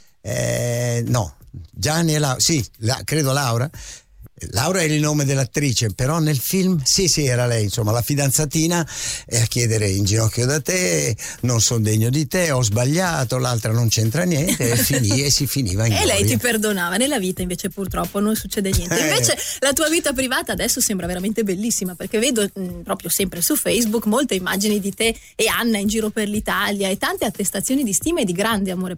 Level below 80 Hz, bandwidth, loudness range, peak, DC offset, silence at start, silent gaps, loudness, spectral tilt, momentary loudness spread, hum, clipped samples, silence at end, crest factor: -40 dBFS; 16.5 kHz; 2 LU; -6 dBFS; under 0.1%; 0.25 s; none; -19 LUFS; -4 dB/octave; 7 LU; none; under 0.1%; 0 s; 14 dB